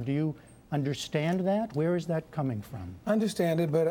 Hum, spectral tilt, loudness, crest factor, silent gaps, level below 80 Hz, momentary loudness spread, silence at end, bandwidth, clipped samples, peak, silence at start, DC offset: none; -7 dB/octave; -30 LUFS; 16 dB; none; -62 dBFS; 10 LU; 0 s; 17 kHz; under 0.1%; -14 dBFS; 0 s; under 0.1%